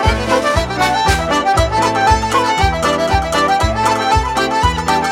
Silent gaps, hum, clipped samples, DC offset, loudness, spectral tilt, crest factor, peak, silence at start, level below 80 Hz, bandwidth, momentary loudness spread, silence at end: none; none; under 0.1%; under 0.1%; -14 LUFS; -4.5 dB/octave; 14 dB; 0 dBFS; 0 s; -24 dBFS; 16.5 kHz; 2 LU; 0 s